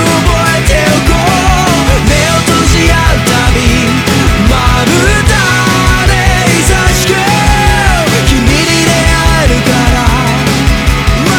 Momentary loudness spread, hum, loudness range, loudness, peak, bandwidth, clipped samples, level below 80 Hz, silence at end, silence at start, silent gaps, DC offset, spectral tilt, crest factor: 2 LU; none; 0 LU; -8 LUFS; 0 dBFS; over 20 kHz; 1%; -14 dBFS; 0 s; 0 s; none; under 0.1%; -4.5 dB/octave; 8 dB